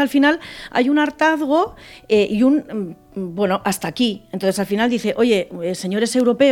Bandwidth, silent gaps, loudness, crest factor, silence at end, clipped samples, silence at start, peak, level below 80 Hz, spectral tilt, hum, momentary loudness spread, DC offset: 17 kHz; none; -19 LUFS; 14 dB; 0 s; under 0.1%; 0 s; -4 dBFS; -54 dBFS; -5 dB/octave; none; 9 LU; under 0.1%